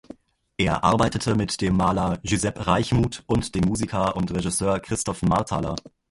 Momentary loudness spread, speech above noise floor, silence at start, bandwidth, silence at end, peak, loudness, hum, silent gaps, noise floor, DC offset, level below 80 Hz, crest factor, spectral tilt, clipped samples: 6 LU; 24 dB; 0.6 s; 11.5 kHz; 0.2 s; -4 dBFS; -23 LUFS; none; none; -47 dBFS; under 0.1%; -40 dBFS; 20 dB; -5.5 dB/octave; under 0.1%